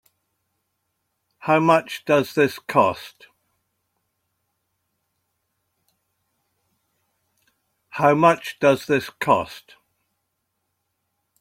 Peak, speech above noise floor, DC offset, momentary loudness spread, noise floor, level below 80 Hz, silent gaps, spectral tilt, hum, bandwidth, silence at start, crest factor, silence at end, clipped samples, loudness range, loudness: -2 dBFS; 56 dB; under 0.1%; 16 LU; -76 dBFS; -66 dBFS; none; -6 dB/octave; none; 16.5 kHz; 1.45 s; 22 dB; 1.8 s; under 0.1%; 5 LU; -20 LUFS